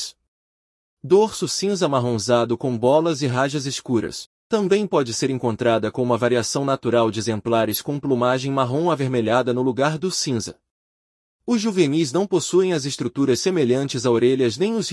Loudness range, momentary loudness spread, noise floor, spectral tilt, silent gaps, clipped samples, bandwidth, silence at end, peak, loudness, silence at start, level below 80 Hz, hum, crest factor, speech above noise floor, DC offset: 2 LU; 6 LU; under -90 dBFS; -5 dB/octave; 0.28-0.97 s, 4.26-4.50 s, 10.71-11.39 s; under 0.1%; 12 kHz; 0 s; -4 dBFS; -21 LUFS; 0 s; -62 dBFS; none; 16 dB; over 70 dB; under 0.1%